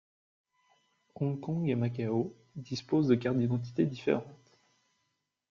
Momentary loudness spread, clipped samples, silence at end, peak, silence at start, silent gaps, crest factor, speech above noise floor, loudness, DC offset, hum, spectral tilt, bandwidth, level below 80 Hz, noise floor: 12 LU; under 0.1%; 1.15 s; -12 dBFS; 1.2 s; none; 20 dB; 50 dB; -32 LUFS; under 0.1%; none; -8 dB/octave; 7.2 kHz; -68 dBFS; -81 dBFS